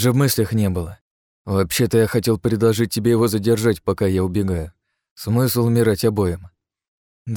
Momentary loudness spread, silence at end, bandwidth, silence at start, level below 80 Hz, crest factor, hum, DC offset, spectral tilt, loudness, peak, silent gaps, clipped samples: 10 LU; 0 s; 19.5 kHz; 0 s; -44 dBFS; 14 dB; none; under 0.1%; -6 dB/octave; -19 LUFS; -4 dBFS; 1.01-1.45 s, 5.11-5.16 s, 6.88-7.25 s; under 0.1%